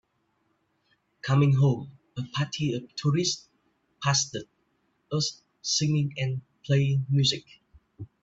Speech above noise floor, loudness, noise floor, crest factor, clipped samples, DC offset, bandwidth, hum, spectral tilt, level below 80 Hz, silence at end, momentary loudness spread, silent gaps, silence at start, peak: 47 dB; -27 LUFS; -73 dBFS; 18 dB; under 0.1%; under 0.1%; 8 kHz; none; -4.5 dB/octave; -64 dBFS; 0.15 s; 13 LU; none; 1.25 s; -10 dBFS